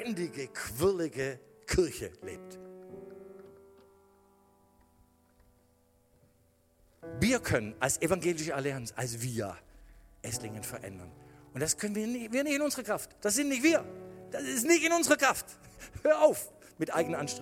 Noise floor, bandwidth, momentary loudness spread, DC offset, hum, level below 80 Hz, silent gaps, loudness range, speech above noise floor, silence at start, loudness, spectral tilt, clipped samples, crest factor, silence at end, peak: -68 dBFS; 17 kHz; 23 LU; under 0.1%; none; -56 dBFS; none; 10 LU; 37 dB; 0 s; -31 LUFS; -4 dB/octave; under 0.1%; 22 dB; 0 s; -10 dBFS